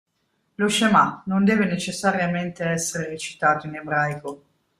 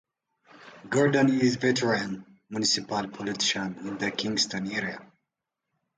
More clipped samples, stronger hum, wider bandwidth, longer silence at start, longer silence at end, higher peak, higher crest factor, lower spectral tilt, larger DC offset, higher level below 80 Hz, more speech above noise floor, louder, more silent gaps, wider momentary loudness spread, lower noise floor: neither; neither; first, 14.5 kHz vs 9.6 kHz; about the same, 0.6 s vs 0.6 s; second, 0.45 s vs 0.9 s; first, -4 dBFS vs -10 dBFS; about the same, 18 dB vs 18 dB; about the same, -4.5 dB/octave vs -4 dB/octave; neither; about the same, -62 dBFS vs -66 dBFS; second, 49 dB vs 58 dB; first, -22 LUFS vs -26 LUFS; neither; second, 9 LU vs 13 LU; second, -71 dBFS vs -85 dBFS